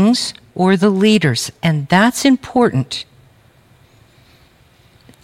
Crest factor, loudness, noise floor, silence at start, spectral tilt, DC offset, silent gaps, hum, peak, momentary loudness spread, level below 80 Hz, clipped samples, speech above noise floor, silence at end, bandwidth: 16 dB; -15 LUFS; -50 dBFS; 0 s; -5 dB/octave; under 0.1%; none; none; -2 dBFS; 11 LU; -56 dBFS; under 0.1%; 36 dB; 2.2 s; 16 kHz